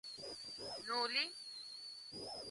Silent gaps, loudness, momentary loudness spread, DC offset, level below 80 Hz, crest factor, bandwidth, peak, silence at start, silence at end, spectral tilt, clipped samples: none; -42 LUFS; 12 LU; under 0.1%; -80 dBFS; 22 dB; 11.5 kHz; -24 dBFS; 0.05 s; 0 s; -1 dB/octave; under 0.1%